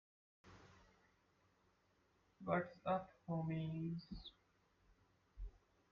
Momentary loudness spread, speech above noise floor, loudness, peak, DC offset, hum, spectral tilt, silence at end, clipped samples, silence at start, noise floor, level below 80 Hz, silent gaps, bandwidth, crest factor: 19 LU; 35 dB; -45 LUFS; -26 dBFS; under 0.1%; none; -6.5 dB/octave; 0.4 s; under 0.1%; 0.45 s; -78 dBFS; -64 dBFS; none; 6.6 kHz; 22 dB